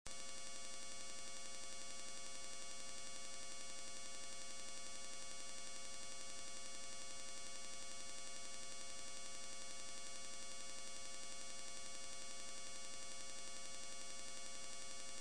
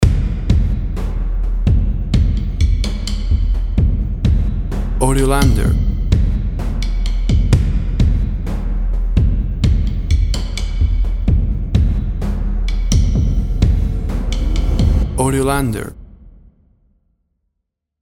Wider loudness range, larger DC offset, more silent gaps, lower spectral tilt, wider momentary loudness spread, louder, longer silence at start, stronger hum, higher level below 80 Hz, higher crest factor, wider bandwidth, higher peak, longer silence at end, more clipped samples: about the same, 0 LU vs 2 LU; first, 0.5% vs under 0.1%; neither; second, -0.5 dB/octave vs -6.5 dB/octave; second, 0 LU vs 7 LU; second, -51 LUFS vs -18 LUFS; about the same, 0.05 s vs 0 s; neither; second, -74 dBFS vs -16 dBFS; first, 26 dB vs 16 dB; second, 11 kHz vs 13 kHz; second, -28 dBFS vs 0 dBFS; second, 0 s vs 1.7 s; neither